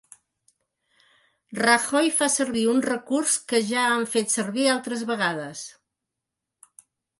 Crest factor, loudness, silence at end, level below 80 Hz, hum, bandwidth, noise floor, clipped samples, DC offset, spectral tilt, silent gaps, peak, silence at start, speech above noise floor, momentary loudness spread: 18 dB; -23 LUFS; 1.5 s; -72 dBFS; none; 12 kHz; -85 dBFS; under 0.1%; under 0.1%; -2.5 dB/octave; none; -6 dBFS; 1.5 s; 62 dB; 11 LU